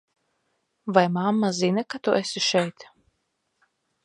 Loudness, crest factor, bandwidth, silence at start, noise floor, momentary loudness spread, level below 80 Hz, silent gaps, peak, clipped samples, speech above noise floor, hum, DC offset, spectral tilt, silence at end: -23 LUFS; 24 dB; 11 kHz; 0.85 s; -75 dBFS; 5 LU; -72 dBFS; none; -2 dBFS; under 0.1%; 52 dB; none; under 0.1%; -4.5 dB/octave; 1.2 s